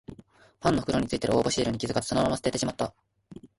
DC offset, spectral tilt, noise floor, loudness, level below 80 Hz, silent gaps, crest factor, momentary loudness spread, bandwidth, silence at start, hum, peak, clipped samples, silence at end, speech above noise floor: under 0.1%; -5 dB/octave; -54 dBFS; -27 LUFS; -50 dBFS; none; 18 dB; 7 LU; 11.5 kHz; 0.1 s; none; -10 dBFS; under 0.1%; 0.15 s; 28 dB